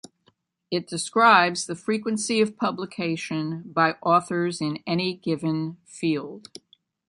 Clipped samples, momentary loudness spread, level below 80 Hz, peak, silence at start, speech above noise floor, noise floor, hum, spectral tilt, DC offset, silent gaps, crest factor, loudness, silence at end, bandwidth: under 0.1%; 11 LU; -72 dBFS; -4 dBFS; 0.7 s; 42 dB; -66 dBFS; none; -4.5 dB/octave; under 0.1%; none; 22 dB; -24 LUFS; 0.7 s; 11.5 kHz